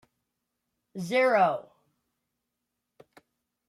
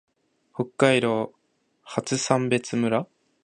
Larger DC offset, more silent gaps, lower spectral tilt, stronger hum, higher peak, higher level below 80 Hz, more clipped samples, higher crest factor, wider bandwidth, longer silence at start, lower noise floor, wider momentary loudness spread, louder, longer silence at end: neither; neither; about the same, -5.5 dB/octave vs -5 dB/octave; neither; second, -12 dBFS vs -2 dBFS; second, -82 dBFS vs -68 dBFS; neither; about the same, 20 dB vs 22 dB; first, 13.5 kHz vs 11 kHz; first, 0.95 s vs 0.6 s; first, -84 dBFS vs -60 dBFS; first, 18 LU vs 14 LU; about the same, -25 LUFS vs -24 LUFS; first, 2.05 s vs 0.4 s